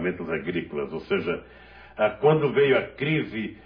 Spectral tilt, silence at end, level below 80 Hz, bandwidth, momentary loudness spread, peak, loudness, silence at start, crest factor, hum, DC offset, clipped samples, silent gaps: -9.5 dB/octave; 0.05 s; -56 dBFS; 5.2 kHz; 11 LU; -8 dBFS; -25 LUFS; 0 s; 18 dB; none; under 0.1%; under 0.1%; none